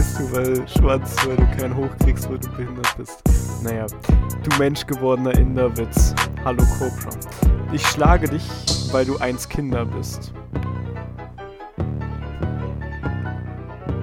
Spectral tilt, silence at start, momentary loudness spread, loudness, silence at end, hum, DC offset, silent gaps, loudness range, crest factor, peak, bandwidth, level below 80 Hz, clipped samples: -5.5 dB/octave; 0 s; 12 LU; -21 LUFS; 0 s; none; under 0.1%; none; 9 LU; 18 dB; -2 dBFS; 17 kHz; -24 dBFS; under 0.1%